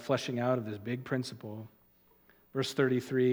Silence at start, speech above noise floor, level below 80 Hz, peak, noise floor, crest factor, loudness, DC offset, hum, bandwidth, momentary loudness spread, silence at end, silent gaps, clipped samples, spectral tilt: 0 s; 34 dB; -76 dBFS; -14 dBFS; -66 dBFS; 18 dB; -33 LUFS; under 0.1%; none; 18 kHz; 15 LU; 0 s; none; under 0.1%; -6 dB/octave